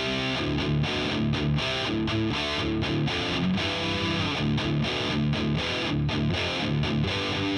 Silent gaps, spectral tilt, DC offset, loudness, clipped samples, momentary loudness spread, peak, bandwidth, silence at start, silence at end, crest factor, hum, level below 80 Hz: none; -5.5 dB/octave; under 0.1%; -26 LUFS; under 0.1%; 1 LU; -14 dBFS; 11 kHz; 0 s; 0 s; 12 dB; none; -42 dBFS